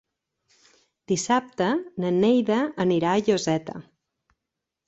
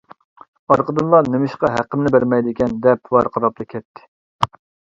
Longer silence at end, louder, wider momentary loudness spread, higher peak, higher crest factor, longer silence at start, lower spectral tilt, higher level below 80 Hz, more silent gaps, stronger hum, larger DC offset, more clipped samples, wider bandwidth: first, 1.05 s vs 0.5 s; second, -23 LUFS vs -17 LUFS; about the same, 8 LU vs 9 LU; second, -8 dBFS vs 0 dBFS; about the same, 16 dB vs 18 dB; first, 1.1 s vs 0.7 s; second, -5.5 dB/octave vs -8 dB/octave; second, -64 dBFS vs -50 dBFS; second, none vs 3.85-3.94 s, 4.08-4.39 s; neither; neither; neither; about the same, 8.2 kHz vs 7.6 kHz